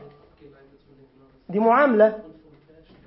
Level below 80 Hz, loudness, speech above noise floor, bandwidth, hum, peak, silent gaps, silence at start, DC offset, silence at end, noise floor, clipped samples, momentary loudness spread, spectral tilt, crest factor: -64 dBFS; -19 LUFS; 31 dB; 5.8 kHz; none; -6 dBFS; none; 1.5 s; under 0.1%; 0.85 s; -52 dBFS; under 0.1%; 14 LU; -11 dB/octave; 18 dB